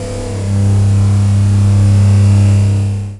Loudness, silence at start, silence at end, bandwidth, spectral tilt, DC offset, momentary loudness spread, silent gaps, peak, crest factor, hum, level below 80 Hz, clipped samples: -11 LUFS; 0 s; 0 s; 11.5 kHz; -7.5 dB/octave; under 0.1%; 7 LU; none; -2 dBFS; 8 dB; none; -28 dBFS; under 0.1%